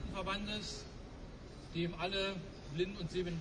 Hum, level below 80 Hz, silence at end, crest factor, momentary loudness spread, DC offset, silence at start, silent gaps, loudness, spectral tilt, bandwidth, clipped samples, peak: none; -52 dBFS; 0 s; 16 dB; 15 LU; under 0.1%; 0 s; none; -40 LUFS; -5 dB/octave; 10.5 kHz; under 0.1%; -24 dBFS